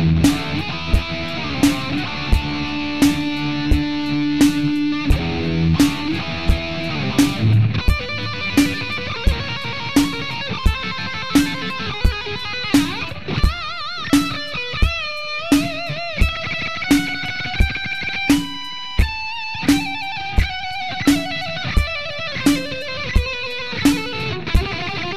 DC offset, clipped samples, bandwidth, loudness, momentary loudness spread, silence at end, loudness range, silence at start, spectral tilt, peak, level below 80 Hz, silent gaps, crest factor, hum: 2%; under 0.1%; 14 kHz; -20 LUFS; 7 LU; 0 s; 2 LU; 0 s; -5 dB/octave; -6 dBFS; -26 dBFS; none; 14 dB; none